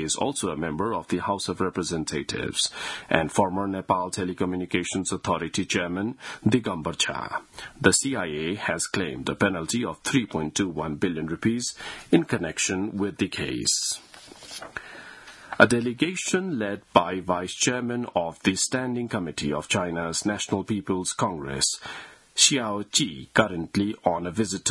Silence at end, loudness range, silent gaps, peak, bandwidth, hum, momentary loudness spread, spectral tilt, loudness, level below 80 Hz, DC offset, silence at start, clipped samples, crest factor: 0 s; 3 LU; none; 0 dBFS; 12 kHz; none; 9 LU; -3.5 dB/octave; -26 LUFS; -56 dBFS; under 0.1%; 0 s; under 0.1%; 26 dB